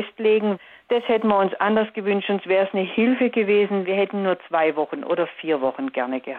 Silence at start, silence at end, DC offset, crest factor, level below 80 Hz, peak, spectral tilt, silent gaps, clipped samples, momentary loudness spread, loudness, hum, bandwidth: 0 s; 0 s; under 0.1%; 16 dB; -70 dBFS; -6 dBFS; -9 dB/octave; none; under 0.1%; 6 LU; -22 LUFS; none; 4.3 kHz